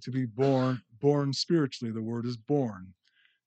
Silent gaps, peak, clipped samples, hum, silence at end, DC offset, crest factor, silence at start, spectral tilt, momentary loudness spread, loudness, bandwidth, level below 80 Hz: none; -12 dBFS; under 0.1%; none; 0.55 s; under 0.1%; 18 dB; 0 s; -6.5 dB/octave; 9 LU; -29 LUFS; 8.8 kHz; -76 dBFS